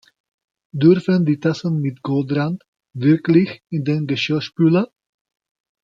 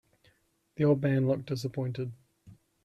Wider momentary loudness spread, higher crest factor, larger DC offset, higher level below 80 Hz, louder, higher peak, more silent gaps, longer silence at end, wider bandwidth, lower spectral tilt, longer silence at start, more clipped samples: second, 10 LU vs 13 LU; about the same, 18 dB vs 18 dB; neither; about the same, -62 dBFS vs -66 dBFS; first, -18 LUFS vs -30 LUFS; first, -2 dBFS vs -12 dBFS; first, 2.68-2.73 s vs none; first, 1 s vs 0.3 s; second, 7.4 kHz vs 12.5 kHz; about the same, -8 dB/octave vs -8 dB/octave; about the same, 0.75 s vs 0.8 s; neither